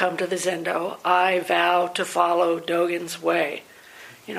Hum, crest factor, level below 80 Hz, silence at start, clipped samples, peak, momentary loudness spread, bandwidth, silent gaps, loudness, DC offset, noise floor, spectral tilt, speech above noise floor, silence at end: none; 18 dB; -76 dBFS; 0 s; under 0.1%; -4 dBFS; 7 LU; 15.5 kHz; none; -22 LUFS; under 0.1%; -46 dBFS; -3.5 dB/octave; 23 dB; 0 s